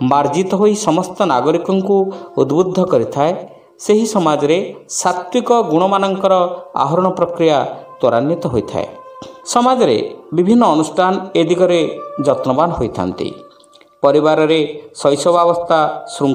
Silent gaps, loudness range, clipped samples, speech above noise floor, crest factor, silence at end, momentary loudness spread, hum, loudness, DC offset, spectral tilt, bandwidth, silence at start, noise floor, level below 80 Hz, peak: none; 2 LU; under 0.1%; 32 dB; 14 dB; 0 s; 8 LU; none; -15 LUFS; under 0.1%; -5.5 dB/octave; 16 kHz; 0 s; -47 dBFS; -50 dBFS; 0 dBFS